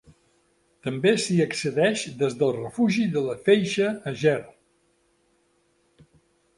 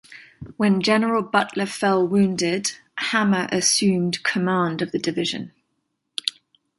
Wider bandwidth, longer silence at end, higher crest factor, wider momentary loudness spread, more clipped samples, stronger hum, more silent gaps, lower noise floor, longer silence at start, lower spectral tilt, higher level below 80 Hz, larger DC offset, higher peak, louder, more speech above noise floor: about the same, 11.5 kHz vs 12 kHz; first, 2.05 s vs 0.5 s; about the same, 20 dB vs 20 dB; second, 6 LU vs 9 LU; neither; neither; neither; second, -67 dBFS vs -74 dBFS; first, 0.85 s vs 0.1 s; first, -5.5 dB/octave vs -4 dB/octave; about the same, -66 dBFS vs -62 dBFS; neither; second, -6 dBFS vs -2 dBFS; second, -24 LUFS vs -21 LUFS; second, 44 dB vs 53 dB